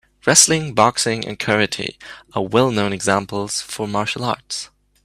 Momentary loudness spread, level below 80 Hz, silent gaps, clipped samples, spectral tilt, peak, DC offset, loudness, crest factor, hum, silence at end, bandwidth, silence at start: 16 LU; -54 dBFS; none; under 0.1%; -3 dB/octave; 0 dBFS; under 0.1%; -18 LUFS; 20 dB; none; 0.4 s; 15.5 kHz; 0.25 s